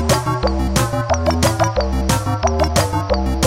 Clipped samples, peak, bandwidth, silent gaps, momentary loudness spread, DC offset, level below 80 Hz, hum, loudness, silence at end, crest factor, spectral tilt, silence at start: under 0.1%; 0 dBFS; 16.5 kHz; none; 3 LU; 0.1%; -24 dBFS; none; -18 LUFS; 0 s; 16 dB; -5 dB/octave; 0 s